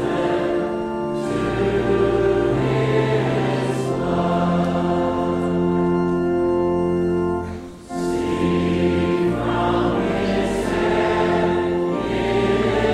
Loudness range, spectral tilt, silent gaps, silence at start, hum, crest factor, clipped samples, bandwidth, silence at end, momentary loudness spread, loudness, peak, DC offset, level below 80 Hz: 1 LU; -7 dB/octave; none; 0 s; none; 14 dB; under 0.1%; 11.5 kHz; 0 s; 4 LU; -20 LUFS; -6 dBFS; under 0.1%; -40 dBFS